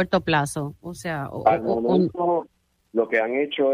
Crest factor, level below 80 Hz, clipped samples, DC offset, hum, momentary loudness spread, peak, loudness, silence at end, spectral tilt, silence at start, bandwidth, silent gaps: 18 dB; -54 dBFS; under 0.1%; under 0.1%; none; 9 LU; -4 dBFS; -23 LUFS; 0 s; -6 dB/octave; 0 s; 15.5 kHz; none